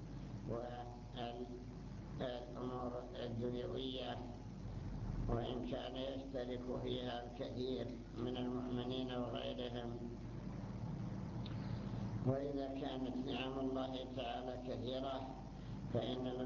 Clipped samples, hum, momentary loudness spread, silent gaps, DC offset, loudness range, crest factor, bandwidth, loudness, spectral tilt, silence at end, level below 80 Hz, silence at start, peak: under 0.1%; none; 8 LU; none; under 0.1%; 3 LU; 18 dB; 7.2 kHz; -45 LUFS; -6 dB/octave; 0 s; -56 dBFS; 0 s; -24 dBFS